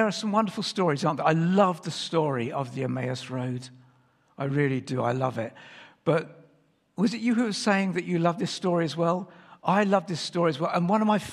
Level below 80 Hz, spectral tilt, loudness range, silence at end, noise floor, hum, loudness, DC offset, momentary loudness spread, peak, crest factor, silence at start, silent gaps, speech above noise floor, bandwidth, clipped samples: -70 dBFS; -6 dB/octave; 4 LU; 0 s; -64 dBFS; none; -26 LUFS; under 0.1%; 10 LU; -6 dBFS; 20 dB; 0 s; none; 39 dB; 12.5 kHz; under 0.1%